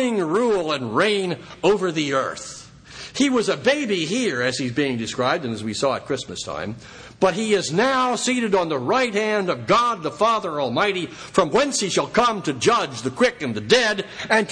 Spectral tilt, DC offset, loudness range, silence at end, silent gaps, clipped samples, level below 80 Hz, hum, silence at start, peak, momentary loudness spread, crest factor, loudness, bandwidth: -4 dB/octave; under 0.1%; 3 LU; 0 s; none; under 0.1%; -56 dBFS; none; 0 s; -2 dBFS; 10 LU; 20 dB; -21 LUFS; 10.5 kHz